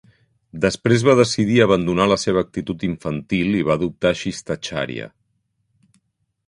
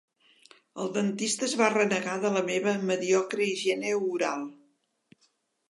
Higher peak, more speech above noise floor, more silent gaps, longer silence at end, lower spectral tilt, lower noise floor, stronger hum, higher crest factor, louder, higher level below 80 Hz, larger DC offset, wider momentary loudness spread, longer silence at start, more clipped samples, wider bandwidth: first, 0 dBFS vs -8 dBFS; first, 51 dB vs 44 dB; neither; first, 1.4 s vs 1.2 s; first, -5.5 dB/octave vs -3.5 dB/octave; about the same, -70 dBFS vs -71 dBFS; neither; about the same, 20 dB vs 20 dB; first, -19 LUFS vs -28 LUFS; first, -48 dBFS vs -82 dBFS; neither; first, 12 LU vs 8 LU; second, 0.55 s vs 0.75 s; neither; about the same, 11.5 kHz vs 11.5 kHz